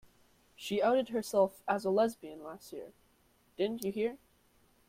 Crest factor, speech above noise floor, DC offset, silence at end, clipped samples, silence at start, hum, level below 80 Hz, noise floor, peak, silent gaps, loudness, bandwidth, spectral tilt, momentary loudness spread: 20 dB; 36 dB; under 0.1%; 0.7 s; under 0.1%; 0.6 s; none; -74 dBFS; -69 dBFS; -16 dBFS; none; -32 LUFS; 16.5 kHz; -5 dB/octave; 18 LU